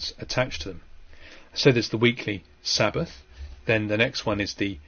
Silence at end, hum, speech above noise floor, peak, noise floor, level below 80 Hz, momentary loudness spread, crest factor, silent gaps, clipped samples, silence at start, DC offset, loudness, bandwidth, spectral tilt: 0.05 s; none; 20 dB; -6 dBFS; -45 dBFS; -46 dBFS; 14 LU; 22 dB; none; under 0.1%; 0 s; under 0.1%; -25 LUFS; 6.8 kHz; -4.5 dB/octave